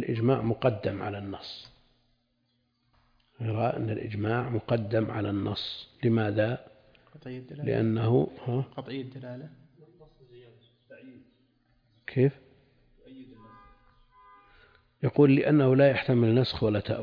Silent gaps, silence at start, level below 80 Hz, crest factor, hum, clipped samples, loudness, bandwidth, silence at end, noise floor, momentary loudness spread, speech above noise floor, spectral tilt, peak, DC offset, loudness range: none; 0 s; -60 dBFS; 20 dB; none; under 0.1%; -27 LUFS; 5.2 kHz; 0 s; -74 dBFS; 19 LU; 47 dB; -9.5 dB/octave; -10 dBFS; under 0.1%; 10 LU